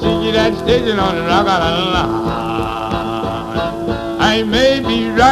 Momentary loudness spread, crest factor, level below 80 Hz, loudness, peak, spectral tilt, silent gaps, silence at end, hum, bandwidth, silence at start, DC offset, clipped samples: 7 LU; 14 dB; -32 dBFS; -15 LUFS; 0 dBFS; -5.5 dB/octave; none; 0 s; none; 14 kHz; 0 s; under 0.1%; under 0.1%